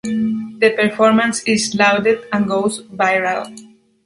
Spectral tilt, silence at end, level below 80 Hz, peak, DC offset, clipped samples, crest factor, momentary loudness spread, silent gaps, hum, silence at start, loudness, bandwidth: -4 dB/octave; 0.4 s; -56 dBFS; 0 dBFS; under 0.1%; under 0.1%; 16 dB; 8 LU; none; none; 0.05 s; -16 LUFS; 11.5 kHz